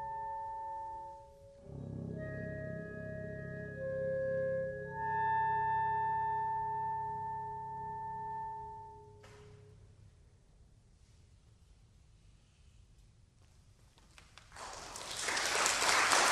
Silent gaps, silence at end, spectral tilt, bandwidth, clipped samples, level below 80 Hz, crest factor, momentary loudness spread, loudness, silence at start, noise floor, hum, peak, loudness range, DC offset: none; 0 s; -2 dB/octave; 15 kHz; under 0.1%; -62 dBFS; 28 dB; 23 LU; -36 LUFS; 0 s; -64 dBFS; none; -10 dBFS; 15 LU; under 0.1%